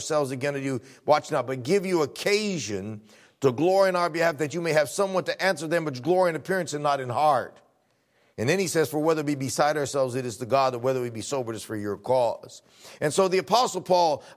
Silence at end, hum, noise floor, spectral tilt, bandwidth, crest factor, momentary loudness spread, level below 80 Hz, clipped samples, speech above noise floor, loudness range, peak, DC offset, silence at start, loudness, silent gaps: 0.05 s; none; -67 dBFS; -4.5 dB/octave; 16 kHz; 18 dB; 9 LU; -66 dBFS; under 0.1%; 42 dB; 2 LU; -6 dBFS; under 0.1%; 0 s; -25 LUFS; none